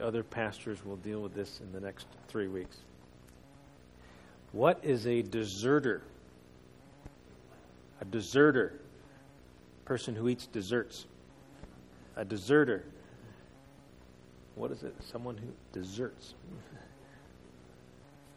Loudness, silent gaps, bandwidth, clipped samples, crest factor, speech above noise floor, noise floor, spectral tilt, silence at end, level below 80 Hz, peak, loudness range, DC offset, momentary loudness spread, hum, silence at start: -34 LUFS; none; 13 kHz; under 0.1%; 24 dB; 24 dB; -57 dBFS; -6 dB/octave; 0.35 s; -62 dBFS; -12 dBFS; 11 LU; under 0.1%; 27 LU; none; 0 s